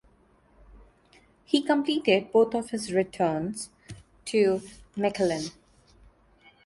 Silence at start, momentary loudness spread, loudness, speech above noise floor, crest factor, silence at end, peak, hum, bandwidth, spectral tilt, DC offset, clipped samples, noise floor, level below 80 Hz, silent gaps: 0.75 s; 16 LU; -26 LUFS; 36 dB; 20 dB; 1.15 s; -8 dBFS; none; 11.5 kHz; -5 dB/octave; under 0.1%; under 0.1%; -61 dBFS; -60 dBFS; none